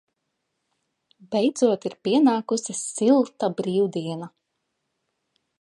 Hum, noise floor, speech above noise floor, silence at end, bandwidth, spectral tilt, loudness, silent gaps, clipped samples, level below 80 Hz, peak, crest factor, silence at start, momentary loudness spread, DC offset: none; -78 dBFS; 56 dB; 1.3 s; 11.5 kHz; -5 dB/octave; -23 LUFS; none; under 0.1%; -76 dBFS; -8 dBFS; 18 dB; 1.3 s; 10 LU; under 0.1%